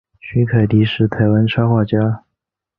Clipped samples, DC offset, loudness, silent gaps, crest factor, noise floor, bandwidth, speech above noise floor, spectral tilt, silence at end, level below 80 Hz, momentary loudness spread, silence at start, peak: under 0.1%; under 0.1%; -16 LUFS; none; 14 dB; -79 dBFS; 4.8 kHz; 65 dB; -10.5 dB/octave; 0.6 s; -44 dBFS; 6 LU; 0.25 s; -2 dBFS